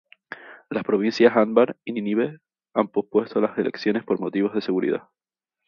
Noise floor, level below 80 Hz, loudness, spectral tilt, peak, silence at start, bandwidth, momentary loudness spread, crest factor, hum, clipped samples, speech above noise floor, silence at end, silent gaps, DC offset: -42 dBFS; -70 dBFS; -23 LUFS; -7 dB/octave; -2 dBFS; 0.3 s; 7 kHz; 12 LU; 22 dB; none; under 0.1%; 20 dB; 0.7 s; none; under 0.1%